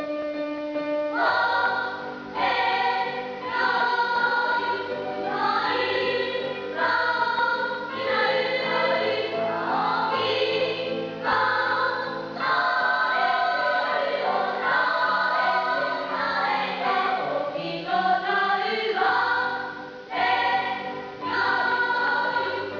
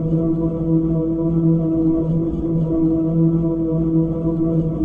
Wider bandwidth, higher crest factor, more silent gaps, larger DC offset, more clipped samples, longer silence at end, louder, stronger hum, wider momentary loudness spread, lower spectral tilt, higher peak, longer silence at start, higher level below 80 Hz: first, 5.4 kHz vs 1.6 kHz; about the same, 14 dB vs 12 dB; neither; second, under 0.1% vs 0.5%; neither; about the same, 0 s vs 0 s; second, -24 LUFS vs -19 LUFS; neither; first, 7 LU vs 3 LU; second, -4.5 dB/octave vs -13 dB/octave; second, -10 dBFS vs -6 dBFS; about the same, 0 s vs 0 s; second, -66 dBFS vs -34 dBFS